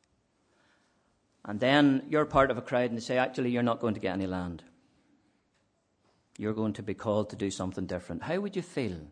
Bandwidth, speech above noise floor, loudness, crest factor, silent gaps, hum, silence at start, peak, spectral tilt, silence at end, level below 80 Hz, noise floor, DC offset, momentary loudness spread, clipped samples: 10 kHz; 44 dB; -30 LUFS; 22 dB; none; none; 1.45 s; -10 dBFS; -6 dB/octave; 0 s; -58 dBFS; -73 dBFS; under 0.1%; 12 LU; under 0.1%